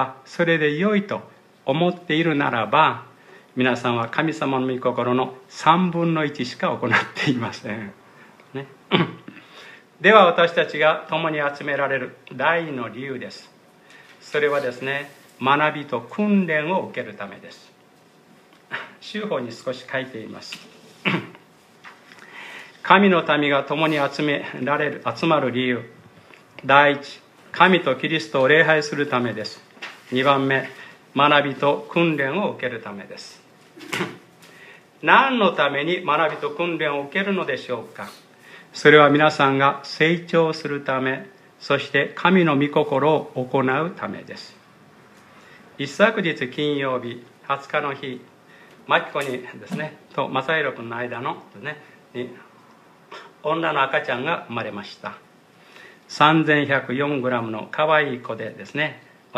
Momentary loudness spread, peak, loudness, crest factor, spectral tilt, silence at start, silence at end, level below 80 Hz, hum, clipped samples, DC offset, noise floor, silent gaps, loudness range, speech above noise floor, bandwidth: 19 LU; 0 dBFS; -21 LUFS; 22 dB; -6 dB/octave; 0 s; 0 s; -72 dBFS; none; under 0.1%; under 0.1%; -53 dBFS; none; 8 LU; 32 dB; 14.5 kHz